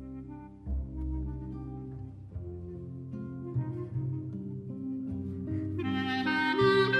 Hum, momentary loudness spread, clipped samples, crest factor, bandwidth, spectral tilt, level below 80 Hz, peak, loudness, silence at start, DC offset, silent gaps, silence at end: none; 15 LU; under 0.1%; 18 dB; 9.4 kHz; -7.5 dB/octave; -44 dBFS; -14 dBFS; -34 LUFS; 0 s; under 0.1%; none; 0 s